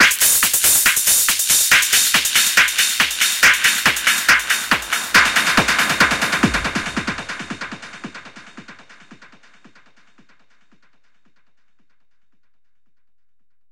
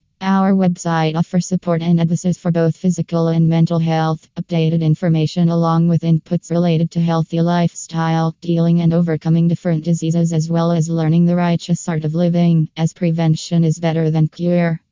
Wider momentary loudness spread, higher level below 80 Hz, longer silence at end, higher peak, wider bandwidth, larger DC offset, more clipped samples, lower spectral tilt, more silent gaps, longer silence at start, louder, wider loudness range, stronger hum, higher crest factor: first, 17 LU vs 4 LU; first, -46 dBFS vs -54 dBFS; first, 4.55 s vs 0.15 s; about the same, -2 dBFS vs -4 dBFS; first, 17 kHz vs 7.6 kHz; neither; neither; second, 0 dB/octave vs -7.5 dB/octave; neither; second, 0 s vs 0.2 s; first, -14 LUFS vs -17 LUFS; first, 17 LU vs 1 LU; neither; first, 18 dB vs 12 dB